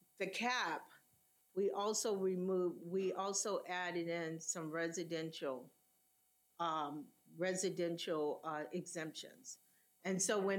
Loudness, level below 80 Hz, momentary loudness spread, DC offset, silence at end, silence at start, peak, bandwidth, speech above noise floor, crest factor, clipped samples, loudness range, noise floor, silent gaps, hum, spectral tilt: -40 LUFS; under -90 dBFS; 10 LU; under 0.1%; 0 s; 0.2 s; -24 dBFS; 18 kHz; 37 dB; 18 dB; under 0.1%; 4 LU; -77 dBFS; none; none; -3.5 dB/octave